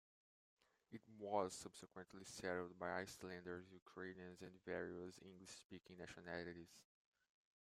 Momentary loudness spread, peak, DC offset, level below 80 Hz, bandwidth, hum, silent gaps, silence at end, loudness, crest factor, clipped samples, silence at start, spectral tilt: 15 LU; -28 dBFS; under 0.1%; -84 dBFS; 15 kHz; none; 3.82-3.86 s, 5.65-5.70 s; 0.9 s; -52 LUFS; 26 dB; under 0.1%; 0.9 s; -4.5 dB/octave